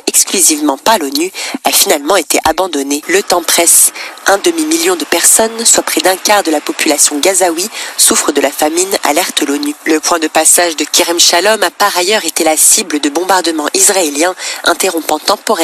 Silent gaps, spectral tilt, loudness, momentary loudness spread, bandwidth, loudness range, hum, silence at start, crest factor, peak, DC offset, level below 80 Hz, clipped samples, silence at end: none; 0 dB/octave; -9 LUFS; 8 LU; over 20 kHz; 2 LU; none; 0.05 s; 10 dB; 0 dBFS; under 0.1%; -50 dBFS; 0.2%; 0 s